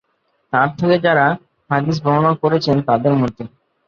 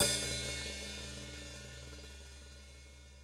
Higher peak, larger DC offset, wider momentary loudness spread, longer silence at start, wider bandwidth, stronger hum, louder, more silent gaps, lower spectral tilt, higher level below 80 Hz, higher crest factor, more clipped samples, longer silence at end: first, -2 dBFS vs -16 dBFS; neither; second, 8 LU vs 19 LU; first, 0.55 s vs 0 s; second, 7 kHz vs 16 kHz; neither; first, -16 LUFS vs -40 LUFS; neither; first, -7.5 dB/octave vs -2 dB/octave; about the same, -54 dBFS vs -52 dBFS; second, 16 dB vs 24 dB; neither; first, 0.4 s vs 0 s